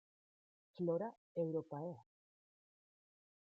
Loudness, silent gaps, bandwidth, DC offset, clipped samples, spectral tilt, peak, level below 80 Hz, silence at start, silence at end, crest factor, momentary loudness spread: -43 LUFS; 1.17-1.35 s; 5.2 kHz; under 0.1%; under 0.1%; -9.5 dB/octave; -26 dBFS; under -90 dBFS; 0.75 s; 1.45 s; 20 dB; 9 LU